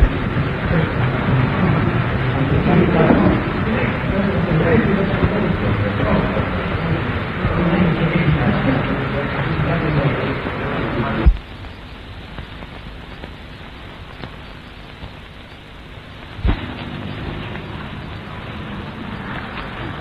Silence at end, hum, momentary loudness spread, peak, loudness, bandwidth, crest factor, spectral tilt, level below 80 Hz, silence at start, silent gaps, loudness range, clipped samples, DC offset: 0 s; none; 20 LU; 0 dBFS; -19 LUFS; 5.4 kHz; 18 dB; -9 dB/octave; -28 dBFS; 0 s; none; 18 LU; under 0.1%; under 0.1%